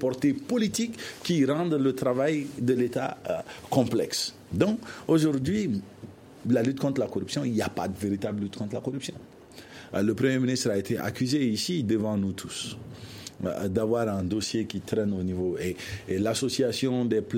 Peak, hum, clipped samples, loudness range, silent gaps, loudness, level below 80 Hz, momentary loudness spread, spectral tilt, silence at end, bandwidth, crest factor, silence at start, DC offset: -8 dBFS; none; under 0.1%; 3 LU; none; -28 LUFS; -60 dBFS; 10 LU; -5.5 dB/octave; 0 s; 16.5 kHz; 20 dB; 0 s; under 0.1%